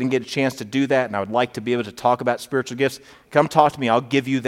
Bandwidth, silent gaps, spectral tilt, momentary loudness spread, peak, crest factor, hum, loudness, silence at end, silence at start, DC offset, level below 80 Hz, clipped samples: 15.5 kHz; none; -5.5 dB/octave; 6 LU; 0 dBFS; 20 dB; none; -21 LUFS; 0 s; 0 s; under 0.1%; -62 dBFS; under 0.1%